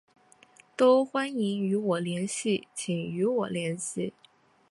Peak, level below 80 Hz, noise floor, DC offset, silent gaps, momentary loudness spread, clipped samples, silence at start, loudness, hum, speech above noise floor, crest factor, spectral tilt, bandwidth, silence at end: -10 dBFS; -74 dBFS; -58 dBFS; under 0.1%; none; 11 LU; under 0.1%; 0.8 s; -28 LUFS; none; 31 dB; 18 dB; -5 dB/octave; 11.5 kHz; 0.6 s